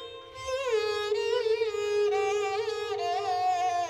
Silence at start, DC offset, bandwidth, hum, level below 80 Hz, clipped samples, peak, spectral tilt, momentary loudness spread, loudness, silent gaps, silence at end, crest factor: 0 s; under 0.1%; 12.5 kHz; none; -64 dBFS; under 0.1%; -18 dBFS; -2 dB/octave; 5 LU; -29 LUFS; none; 0 s; 12 dB